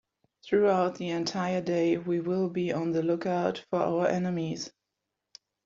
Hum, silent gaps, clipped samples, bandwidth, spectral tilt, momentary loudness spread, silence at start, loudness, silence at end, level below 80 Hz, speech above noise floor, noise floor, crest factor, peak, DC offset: none; none; under 0.1%; 7.6 kHz; -5.5 dB/octave; 6 LU; 0.45 s; -29 LUFS; 0.95 s; -70 dBFS; 57 dB; -85 dBFS; 18 dB; -12 dBFS; under 0.1%